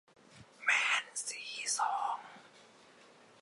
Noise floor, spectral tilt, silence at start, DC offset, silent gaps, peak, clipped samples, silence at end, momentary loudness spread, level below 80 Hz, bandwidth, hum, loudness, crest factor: -61 dBFS; 2 dB/octave; 0.3 s; under 0.1%; none; -16 dBFS; under 0.1%; 0.8 s; 11 LU; -84 dBFS; 12 kHz; none; -33 LUFS; 22 dB